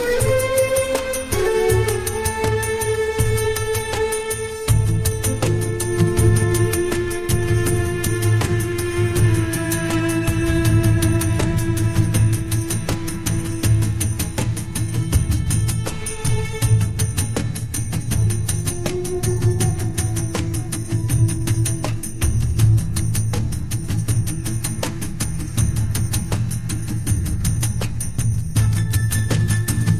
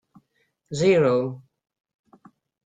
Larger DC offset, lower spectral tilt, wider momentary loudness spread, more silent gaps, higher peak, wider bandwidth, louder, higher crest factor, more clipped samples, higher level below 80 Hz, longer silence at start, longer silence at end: neither; about the same, -5.5 dB/octave vs -6 dB/octave; second, 6 LU vs 17 LU; neither; first, -4 dBFS vs -8 dBFS; first, 15.5 kHz vs 9.2 kHz; about the same, -20 LUFS vs -22 LUFS; about the same, 16 dB vs 18 dB; neither; first, -30 dBFS vs -64 dBFS; second, 0 s vs 0.7 s; second, 0 s vs 1.25 s